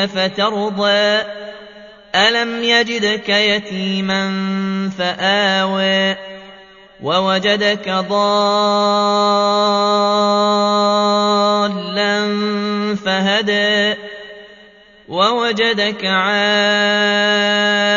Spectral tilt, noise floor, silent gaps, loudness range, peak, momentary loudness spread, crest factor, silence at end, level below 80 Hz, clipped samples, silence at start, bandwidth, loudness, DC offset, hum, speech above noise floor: -4 dB/octave; -45 dBFS; none; 3 LU; 0 dBFS; 6 LU; 16 dB; 0 s; -60 dBFS; under 0.1%; 0 s; 7.4 kHz; -15 LUFS; under 0.1%; none; 29 dB